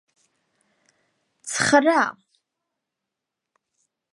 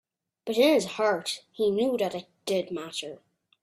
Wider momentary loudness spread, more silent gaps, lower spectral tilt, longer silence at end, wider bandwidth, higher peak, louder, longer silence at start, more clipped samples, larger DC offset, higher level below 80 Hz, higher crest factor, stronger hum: about the same, 14 LU vs 14 LU; neither; about the same, -3 dB/octave vs -4 dB/octave; first, 2 s vs 0.5 s; second, 11.5 kHz vs 15.5 kHz; first, -2 dBFS vs -10 dBFS; first, -20 LUFS vs -27 LUFS; first, 1.45 s vs 0.45 s; neither; neither; about the same, -68 dBFS vs -72 dBFS; first, 24 dB vs 18 dB; neither